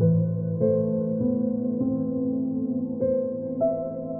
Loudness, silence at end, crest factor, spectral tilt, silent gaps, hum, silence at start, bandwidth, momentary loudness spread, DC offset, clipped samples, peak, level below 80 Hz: -26 LUFS; 0 s; 14 dB; -16.5 dB/octave; none; none; 0 s; 1.7 kHz; 4 LU; under 0.1%; under 0.1%; -10 dBFS; -60 dBFS